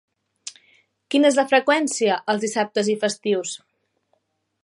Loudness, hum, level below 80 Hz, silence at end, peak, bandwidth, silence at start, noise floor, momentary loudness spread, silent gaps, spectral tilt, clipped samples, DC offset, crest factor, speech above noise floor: -21 LUFS; none; -78 dBFS; 1.05 s; -4 dBFS; 11.5 kHz; 0.45 s; -70 dBFS; 20 LU; none; -3 dB/octave; under 0.1%; under 0.1%; 18 dB; 50 dB